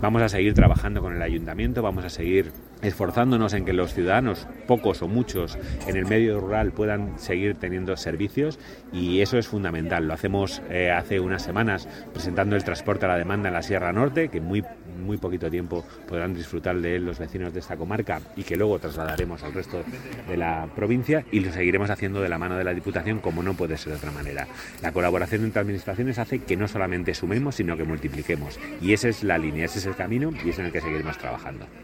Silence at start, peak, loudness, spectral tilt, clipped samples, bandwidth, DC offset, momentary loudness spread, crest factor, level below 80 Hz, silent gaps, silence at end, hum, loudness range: 0 s; -2 dBFS; -26 LUFS; -6.5 dB/octave; under 0.1%; 16.5 kHz; under 0.1%; 10 LU; 24 dB; -38 dBFS; none; 0 s; none; 4 LU